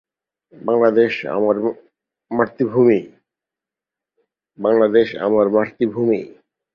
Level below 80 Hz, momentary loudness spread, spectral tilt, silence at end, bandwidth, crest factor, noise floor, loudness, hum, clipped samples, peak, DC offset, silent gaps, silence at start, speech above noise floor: -62 dBFS; 9 LU; -8.5 dB/octave; 0.5 s; 5.8 kHz; 16 dB; -87 dBFS; -18 LUFS; none; under 0.1%; -2 dBFS; under 0.1%; none; 0.6 s; 71 dB